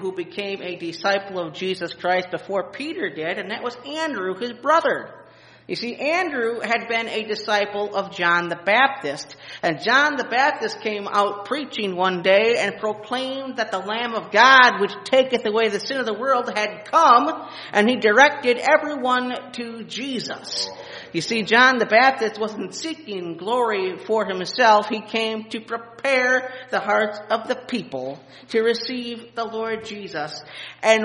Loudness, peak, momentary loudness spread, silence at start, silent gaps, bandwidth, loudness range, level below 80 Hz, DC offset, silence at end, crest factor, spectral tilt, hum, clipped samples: -21 LUFS; 0 dBFS; 14 LU; 0 s; none; 10.5 kHz; 7 LU; -70 dBFS; under 0.1%; 0 s; 22 dB; -3.5 dB/octave; none; under 0.1%